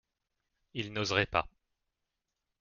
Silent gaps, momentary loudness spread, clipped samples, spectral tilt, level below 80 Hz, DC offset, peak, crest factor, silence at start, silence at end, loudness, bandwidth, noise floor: none; 14 LU; under 0.1%; -2.5 dB/octave; -60 dBFS; under 0.1%; -12 dBFS; 26 dB; 0.75 s; 1.15 s; -32 LUFS; 7.2 kHz; -86 dBFS